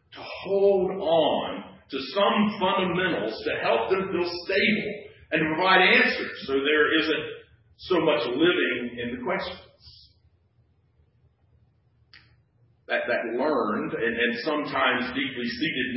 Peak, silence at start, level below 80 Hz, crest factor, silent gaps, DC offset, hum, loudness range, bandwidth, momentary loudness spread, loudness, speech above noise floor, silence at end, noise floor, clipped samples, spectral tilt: -6 dBFS; 0.1 s; -60 dBFS; 20 dB; none; under 0.1%; none; 11 LU; 5.8 kHz; 13 LU; -24 LUFS; 40 dB; 0 s; -64 dBFS; under 0.1%; -9 dB/octave